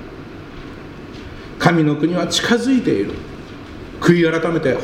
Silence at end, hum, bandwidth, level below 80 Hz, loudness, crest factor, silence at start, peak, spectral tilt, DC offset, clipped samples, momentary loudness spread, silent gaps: 0 s; none; 15.5 kHz; -42 dBFS; -17 LUFS; 18 dB; 0 s; 0 dBFS; -5.5 dB/octave; under 0.1%; under 0.1%; 20 LU; none